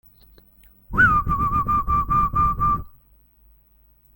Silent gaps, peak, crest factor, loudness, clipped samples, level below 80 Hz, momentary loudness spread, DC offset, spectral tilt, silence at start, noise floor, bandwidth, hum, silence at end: none; -6 dBFS; 18 dB; -20 LUFS; under 0.1%; -34 dBFS; 6 LU; under 0.1%; -7.5 dB/octave; 0.9 s; -57 dBFS; 17 kHz; none; 1.3 s